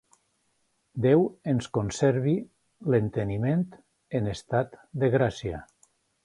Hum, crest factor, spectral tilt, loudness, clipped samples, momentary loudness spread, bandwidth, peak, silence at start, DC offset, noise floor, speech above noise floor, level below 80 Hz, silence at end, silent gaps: none; 18 dB; -7.5 dB/octave; -27 LUFS; under 0.1%; 13 LU; 11.5 kHz; -8 dBFS; 0.95 s; under 0.1%; -72 dBFS; 47 dB; -54 dBFS; 0.6 s; none